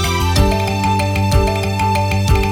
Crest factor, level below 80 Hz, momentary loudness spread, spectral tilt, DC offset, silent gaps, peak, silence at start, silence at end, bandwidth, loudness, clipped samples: 14 dB; -22 dBFS; 2 LU; -5.5 dB/octave; under 0.1%; none; 0 dBFS; 0 s; 0 s; 17.5 kHz; -16 LUFS; under 0.1%